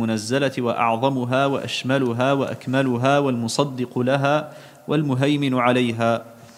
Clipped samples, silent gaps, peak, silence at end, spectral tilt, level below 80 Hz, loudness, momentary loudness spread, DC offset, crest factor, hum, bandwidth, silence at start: under 0.1%; none; -2 dBFS; 0.05 s; -6 dB/octave; -66 dBFS; -21 LUFS; 5 LU; under 0.1%; 18 dB; none; 15.5 kHz; 0 s